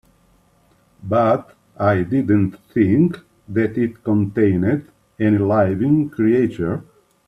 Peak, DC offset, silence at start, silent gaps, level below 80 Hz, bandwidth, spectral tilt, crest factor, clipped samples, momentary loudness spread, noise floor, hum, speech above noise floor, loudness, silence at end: -4 dBFS; under 0.1%; 1.05 s; none; -54 dBFS; 5.6 kHz; -10 dB/octave; 16 dB; under 0.1%; 9 LU; -57 dBFS; none; 40 dB; -19 LUFS; 0.45 s